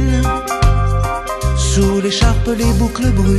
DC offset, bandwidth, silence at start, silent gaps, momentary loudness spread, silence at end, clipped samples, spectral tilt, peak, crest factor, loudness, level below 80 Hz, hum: under 0.1%; 13 kHz; 0 s; none; 4 LU; 0 s; under 0.1%; -5.5 dB/octave; 0 dBFS; 14 dB; -15 LUFS; -18 dBFS; none